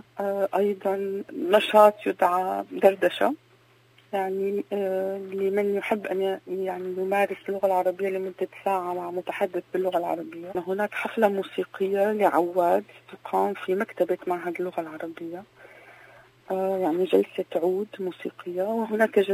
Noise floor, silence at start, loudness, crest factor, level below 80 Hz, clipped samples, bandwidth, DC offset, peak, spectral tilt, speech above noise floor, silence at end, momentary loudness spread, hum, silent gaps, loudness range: -59 dBFS; 0.15 s; -26 LUFS; 22 dB; -76 dBFS; under 0.1%; 16 kHz; under 0.1%; -4 dBFS; -6 dB/octave; 33 dB; 0 s; 11 LU; none; none; 6 LU